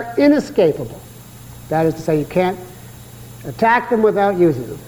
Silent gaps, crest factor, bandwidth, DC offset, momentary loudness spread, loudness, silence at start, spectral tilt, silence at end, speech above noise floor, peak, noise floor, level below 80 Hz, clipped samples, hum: none; 16 dB; 19 kHz; under 0.1%; 23 LU; -16 LUFS; 0 s; -7 dB/octave; 0 s; 21 dB; -2 dBFS; -38 dBFS; -48 dBFS; under 0.1%; none